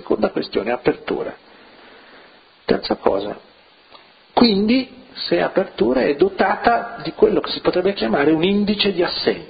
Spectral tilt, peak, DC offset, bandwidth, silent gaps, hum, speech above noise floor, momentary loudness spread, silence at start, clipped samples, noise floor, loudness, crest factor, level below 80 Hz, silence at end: -9.5 dB/octave; 0 dBFS; under 0.1%; 5 kHz; none; none; 30 dB; 10 LU; 0 s; under 0.1%; -48 dBFS; -19 LUFS; 20 dB; -48 dBFS; 0.05 s